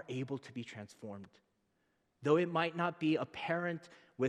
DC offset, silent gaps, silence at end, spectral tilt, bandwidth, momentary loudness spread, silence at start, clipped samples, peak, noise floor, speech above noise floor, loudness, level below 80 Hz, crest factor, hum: under 0.1%; none; 0 s; -6.5 dB/octave; 10.5 kHz; 17 LU; 0.1 s; under 0.1%; -16 dBFS; -79 dBFS; 42 dB; -36 LUFS; -82 dBFS; 22 dB; none